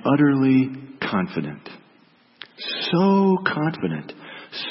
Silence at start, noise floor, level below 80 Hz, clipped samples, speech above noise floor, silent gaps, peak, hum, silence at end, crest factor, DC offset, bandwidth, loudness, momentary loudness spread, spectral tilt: 0 s; -56 dBFS; -64 dBFS; under 0.1%; 36 dB; none; -4 dBFS; none; 0 s; 18 dB; under 0.1%; 5.8 kHz; -21 LUFS; 21 LU; -10.5 dB/octave